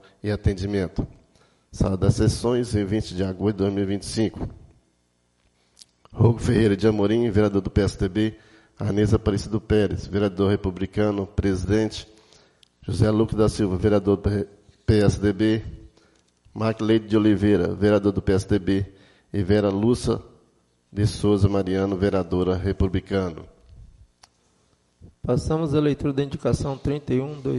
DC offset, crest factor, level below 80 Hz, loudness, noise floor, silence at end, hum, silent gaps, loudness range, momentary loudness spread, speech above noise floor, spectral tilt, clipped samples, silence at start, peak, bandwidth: under 0.1%; 18 dB; -40 dBFS; -23 LUFS; -67 dBFS; 0 s; none; none; 5 LU; 9 LU; 45 dB; -7 dB/octave; under 0.1%; 0.25 s; -6 dBFS; 11.5 kHz